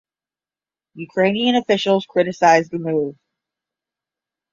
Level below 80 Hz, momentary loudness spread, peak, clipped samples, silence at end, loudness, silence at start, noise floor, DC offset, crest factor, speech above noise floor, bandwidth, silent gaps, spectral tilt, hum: -64 dBFS; 11 LU; -2 dBFS; under 0.1%; 1.4 s; -18 LUFS; 0.95 s; under -90 dBFS; under 0.1%; 18 dB; over 72 dB; 7.6 kHz; none; -5 dB/octave; none